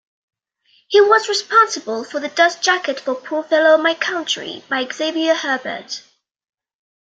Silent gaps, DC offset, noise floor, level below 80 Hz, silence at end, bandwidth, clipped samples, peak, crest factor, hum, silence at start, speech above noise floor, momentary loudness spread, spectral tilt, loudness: none; under 0.1%; -59 dBFS; -74 dBFS; 1.2 s; 9.2 kHz; under 0.1%; -2 dBFS; 18 dB; none; 0.9 s; 42 dB; 11 LU; -1 dB/octave; -17 LUFS